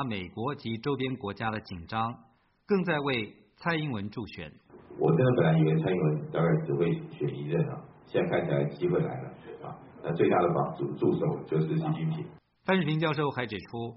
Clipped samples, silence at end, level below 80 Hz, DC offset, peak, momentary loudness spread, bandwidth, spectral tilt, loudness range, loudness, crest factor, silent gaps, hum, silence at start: under 0.1%; 0 s; -62 dBFS; under 0.1%; -10 dBFS; 15 LU; 5.8 kHz; -6 dB/octave; 5 LU; -29 LUFS; 18 dB; none; none; 0 s